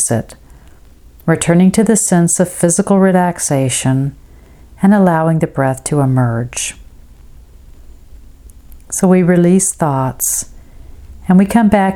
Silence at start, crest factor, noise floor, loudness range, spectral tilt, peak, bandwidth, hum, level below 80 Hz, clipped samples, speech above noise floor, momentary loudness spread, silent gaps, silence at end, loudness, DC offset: 0 s; 14 dB; -40 dBFS; 7 LU; -5.5 dB/octave; 0 dBFS; 16 kHz; none; -40 dBFS; under 0.1%; 28 dB; 10 LU; none; 0 s; -13 LUFS; under 0.1%